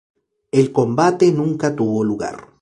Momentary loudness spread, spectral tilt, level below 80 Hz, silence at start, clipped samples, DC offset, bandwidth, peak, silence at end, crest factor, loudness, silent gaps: 8 LU; -7 dB/octave; -56 dBFS; 0.55 s; under 0.1%; under 0.1%; 11 kHz; -2 dBFS; 0.2 s; 16 dB; -18 LUFS; none